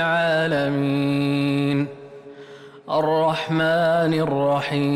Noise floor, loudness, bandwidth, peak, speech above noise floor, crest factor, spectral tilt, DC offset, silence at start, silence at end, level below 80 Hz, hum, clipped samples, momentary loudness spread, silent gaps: -42 dBFS; -21 LUFS; 13.5 kHz; -12 dBFS; 22 dB; 10 dB; -7 dB/octave; under 0.1%; 0 s; 0 s; -60 dBFS; none; under 0.1%; 22 LU; none